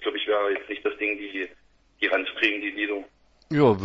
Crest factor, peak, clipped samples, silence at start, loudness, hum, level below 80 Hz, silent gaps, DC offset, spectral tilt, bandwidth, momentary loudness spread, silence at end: 20 dB; -6 dBFS; under 0.1%; 0 s; -26 LUFS; none; -62 dBFS; none; under 0.1%; -7 dB/octave; 7.8 kHz; 11 LU; 0 s